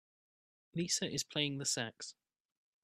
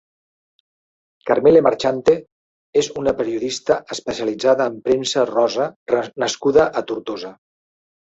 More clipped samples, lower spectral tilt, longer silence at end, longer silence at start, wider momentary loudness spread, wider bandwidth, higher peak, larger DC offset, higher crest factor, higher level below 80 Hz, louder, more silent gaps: neither; second, -2.5 dB/octave vs -4 dB/octave; about the same, 0.7 s vs 0.75 s; second, 0.75 s vs 1.25 s; about the same, 13 LU vs 12 LU; first, 15.5 kHz vs 8 kHz; second, -18 dBFS vs -2 dBFS; neither; about the same, 22 dB vs 18 dB; second, -76 dBFS vs -54 dBFS; second, -37 LUFS vs -19 LUFS; second, none vs 2.32-2.73 s, 5.76-5.86 s